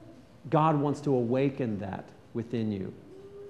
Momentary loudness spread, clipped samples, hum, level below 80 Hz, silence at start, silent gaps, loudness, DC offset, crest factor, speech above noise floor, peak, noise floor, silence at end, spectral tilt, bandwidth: 17 LU; under 0.1%; none; -66 dBFS; 0 s; none; -29 LUFS; under 0.1%; 20 dB; 19 dB; -10 dBFS; -48 dBFS; 0 s; -8.5 dB/octave; 9.8 kHz